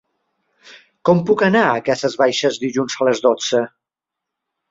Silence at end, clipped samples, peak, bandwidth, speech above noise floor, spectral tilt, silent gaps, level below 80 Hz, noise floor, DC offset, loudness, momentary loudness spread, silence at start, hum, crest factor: 1 s; under 0.1%; -2 dBFS; 7.8 kHz; 68 dB; -4.5 dB/octave; none; -60 dBFS; -84 dBFS; under 0.1%; -17 LUFS; 7 LU; 0.7 s; none; 18 dB